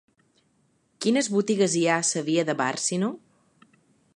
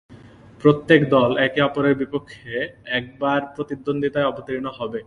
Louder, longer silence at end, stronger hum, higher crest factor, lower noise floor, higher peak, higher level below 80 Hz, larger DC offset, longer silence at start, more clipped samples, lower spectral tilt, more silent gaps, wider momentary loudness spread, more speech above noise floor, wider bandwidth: second, -24 LUFS vs -21 LUFS; first, 1 s vs 0.05 s; neither; about the same, 18 dB vs 20 dB; first, -67 dBFS vs -45 dBFS; second, -8 dBFS vs 0 dBFS; second, -76 dBFS vs -56 dBFS; neither; first, 1 s vs 0.1 s; neither; second, -4 dB/octave vs -7.5 dB/octave; neither; second, 7 LU vs 13 LU; first, 43 dB vs 25 dB; first, 11.5 kHz vs 10 kHz